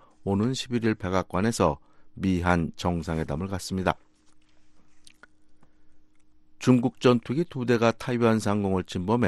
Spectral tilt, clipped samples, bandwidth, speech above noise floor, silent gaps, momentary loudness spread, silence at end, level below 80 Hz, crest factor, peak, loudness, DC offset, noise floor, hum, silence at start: -6.5 dB/octave; under 0.1%; 12.5 kHz; 30 dB; none; 7 LU; 0 s; -50 dBFS; 22 dB; -6 dBFS; -26 LUFS; under 0.1%; -54 dBFS; none; 0.2 s